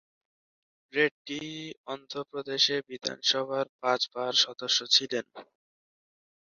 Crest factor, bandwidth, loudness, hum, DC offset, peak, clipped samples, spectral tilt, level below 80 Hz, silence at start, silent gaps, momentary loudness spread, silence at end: 24 dB; 7.2 kHz; -28 LUFS; none; under 0.1%; -8 dBFS; under 0.1%; 0 dB/octave; -80 dBFS; 0.95 s; 1.11-1.25 s, 1.77-1.84 s, 3.69-3.79 s; 14 LU; 1.1 s